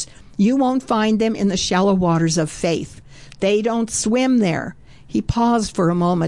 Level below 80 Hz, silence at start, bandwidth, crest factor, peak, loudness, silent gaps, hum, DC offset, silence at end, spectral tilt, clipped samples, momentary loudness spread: -44 dBFS; 0 s; 11.5 kHz; 10 dB; -8 dBFS; -19 LUFS; none; none; 0.4%; 0 s; -5.5 dB/octave; under 0.1%; 9 LU